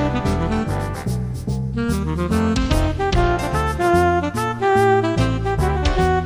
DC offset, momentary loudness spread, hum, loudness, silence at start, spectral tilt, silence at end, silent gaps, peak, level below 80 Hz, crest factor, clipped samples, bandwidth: under 0.1%; 8 LU; none; -20 LUFS; 0 s; -6.5 dB/octave; 0 s; none; -4 dBFS; -26 dBFS; 14 dB; under 0.1%; over 20 kHz